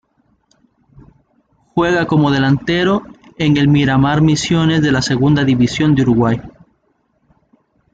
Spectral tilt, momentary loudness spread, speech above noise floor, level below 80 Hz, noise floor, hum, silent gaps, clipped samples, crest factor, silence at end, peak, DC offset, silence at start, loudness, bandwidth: -6 dB/octave; 5 LU; 49 dB; -42 dBFS; -62 dBFS; none; none; under 0.1%; 12 dB; 1.45 s; -2 dBFS; under 0.1%; 1.75 s; -14 LUFS; 9 kHz